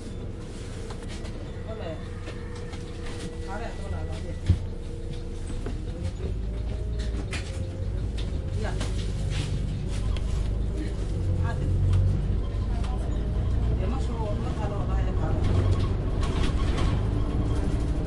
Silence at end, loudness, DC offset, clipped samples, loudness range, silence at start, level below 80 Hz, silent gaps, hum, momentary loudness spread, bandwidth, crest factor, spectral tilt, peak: 0 s; -30 LUFS; under 0.1%; under 0.1%; 8 LU; 0 s; -30 dBFS; none; none; 11 LU; 11.5 kHz; 18 dB; -7 dB/octave; -10 dBFS